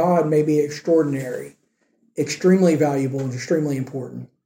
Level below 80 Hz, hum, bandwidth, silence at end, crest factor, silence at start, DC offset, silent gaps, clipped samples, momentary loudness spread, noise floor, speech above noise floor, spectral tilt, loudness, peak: -68 dBFS; none; 16.5 kHz; 0.2 s; 16 dB; 0 s; under 0.1%; none; under 0.1%; 16 LU; -65 dBFS; 45 dB; -7 dB/octave; -20 LUFS; -6 dBFS